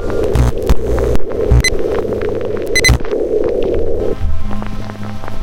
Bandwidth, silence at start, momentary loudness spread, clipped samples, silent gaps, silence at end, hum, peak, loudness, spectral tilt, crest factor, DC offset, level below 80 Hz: 16.5 kHz; 0 s; 12 LU; under 0.1%; none; 0 s; none; 0 dBFS; -16 LUFS; -5 dB/octave; 12 dB; under 0.1%; -18 dBFS